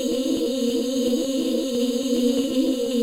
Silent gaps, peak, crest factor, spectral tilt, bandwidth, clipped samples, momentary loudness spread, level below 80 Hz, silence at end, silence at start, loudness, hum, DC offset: none; -10 dBFS; 14 dB; -3.5 dB/octave; 16 kHz; under 0.1%; 2 LU; -54 dBFS; 0 s; 0 s; -23 LUFS; none; under 0.1%